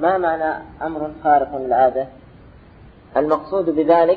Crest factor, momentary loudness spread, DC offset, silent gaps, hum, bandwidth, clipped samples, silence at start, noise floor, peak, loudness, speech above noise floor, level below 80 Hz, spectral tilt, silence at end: 16 dB; 11 LU; under 0.1%; none; none; 4.9 kHz; under 0.1%; 0 s; -45 dBFS; -2 dBFS; -19 LUFS; 27 dB; -50 dBFS; -9 dB/octave; 0 s